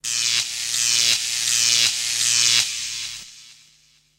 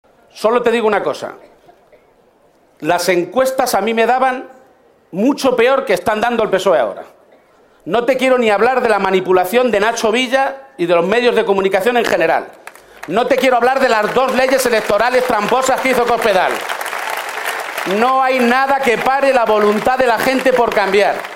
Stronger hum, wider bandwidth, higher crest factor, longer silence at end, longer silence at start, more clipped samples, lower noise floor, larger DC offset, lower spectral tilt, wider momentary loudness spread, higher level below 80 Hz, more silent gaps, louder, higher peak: neither; about the same, 16.5 kHz vs 16.5 kHz; first, 22 dB vs 14 dB; first, 0.65 s vs 0 s; second, 0.05 s vs 0.35 s; neither; first, -58 dBFS vs -52 dBFS; neither; second, 2.5 dB/octave vs -4 dB/octave; first, 12 LU vs 8 LU; second, -62 dBFS vs -50 dBFS; neither; second, -18 LUFS vs -14 LUFS; about the same, -2 dBFS vs 0 dBFS